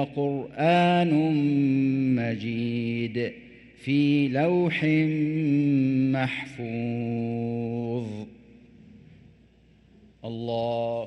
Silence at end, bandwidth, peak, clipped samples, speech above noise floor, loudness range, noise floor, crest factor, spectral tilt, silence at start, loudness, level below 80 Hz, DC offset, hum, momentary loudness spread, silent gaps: 0 s; 8.8 kHz; -10 dBFS; under 0.1%; 33 dB; 10 LU; -57 dBFS; 14 dB; -8.5 dB/octave; 0 s; -25 LUFS; -62 dBFS; under 0.1%; none; 11 LU; none